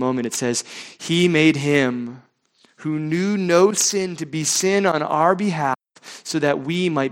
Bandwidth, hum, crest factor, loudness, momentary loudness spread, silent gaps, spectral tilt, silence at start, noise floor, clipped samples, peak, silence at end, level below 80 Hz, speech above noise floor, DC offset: 17 kHz; none; 18 dB; -20 LUFS; 14 LU; none; -4 dB/octave; 0 s; -60 dBFS; under 0.1%; -2 dBFS; 0 s; -64 dBFS; 40 dB; under 0.1%